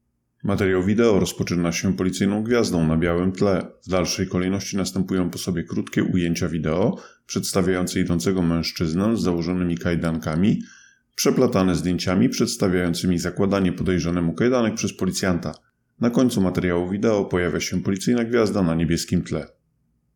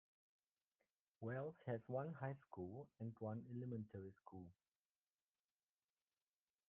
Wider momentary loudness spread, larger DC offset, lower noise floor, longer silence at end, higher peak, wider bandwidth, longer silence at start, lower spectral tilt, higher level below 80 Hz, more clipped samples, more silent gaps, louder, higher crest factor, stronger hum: second, 6 LU vs 12 LU; neither; second, -68 dBFS vs under -90 dBFS; second, 0.7 s vs 2.15 s; first, -6 dBFS vs -32 dBFS; first, 18.5 kHz vs 3.7 kHz; second, 0.45 s vs 1.2 s; about the same, -5.5 dB/octave vs -6 dB/octave; first, -46 dBFS vs -88 dBFS; neither; neither; first, -22 LUFS vs -52 LUFS; about the same, 16 dB vs 20 dB; neither